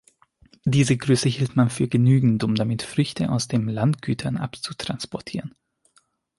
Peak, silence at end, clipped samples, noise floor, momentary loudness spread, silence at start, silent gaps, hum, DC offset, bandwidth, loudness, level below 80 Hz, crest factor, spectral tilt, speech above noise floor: -6 dBFS; 0.9 s; under 0.1%; -64 dBFS; 12 LU; 0.65 s; none; none; under 0.1%; 11.5 kHz; -23 LUFS; -54 dBFS; 16 dB; -6 dB/octave; 42 dB